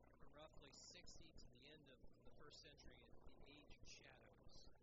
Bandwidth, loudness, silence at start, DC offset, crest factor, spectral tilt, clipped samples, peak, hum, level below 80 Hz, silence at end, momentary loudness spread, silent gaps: 7.6 kHz; -65 LUFS; 0 s; under 0.1%; 14 dB; -3 dB/octave; under 0.1%; -50 dBFS; none; -70 dBFS; 0 s; 7 LU; none